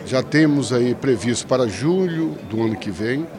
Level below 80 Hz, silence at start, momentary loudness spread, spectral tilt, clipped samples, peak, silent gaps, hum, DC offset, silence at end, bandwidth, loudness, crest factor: -54 dBFS; 0 s; 7 LU; -5.5 dB/octave; under 0.1%; -4 dBFS; none; none; under 0.1%; 0 s; 12 kHz; -20 LUFS; 16 dB